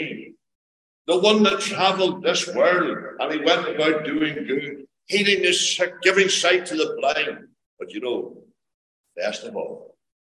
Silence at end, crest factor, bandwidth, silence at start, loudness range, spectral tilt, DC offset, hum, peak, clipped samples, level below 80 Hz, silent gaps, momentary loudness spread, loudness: 0.4 s; 20 dB; 12 kHz; 0 s; 6 LU; -2.5 dB/octave; under 0.1%; none; -2 dBFS; under 0.1%; -70 dBFS; 0.55-1.05 s, 7.66-7.77 s, 8.74-9.04 s; 17 LU; -21 LUFS